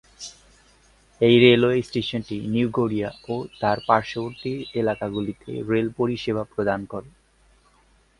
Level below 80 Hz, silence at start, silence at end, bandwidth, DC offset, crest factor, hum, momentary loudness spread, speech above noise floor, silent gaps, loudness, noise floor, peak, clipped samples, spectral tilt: -54 dBFS; 0.2 s; 1.1 s; 11 kHz; under 0.1%; 22 dB; none; 15 LU; 37 dB; none; -23 LUFS; -59 dBFS; -2 dBFS; under 0.1%; -6.5 dB/octave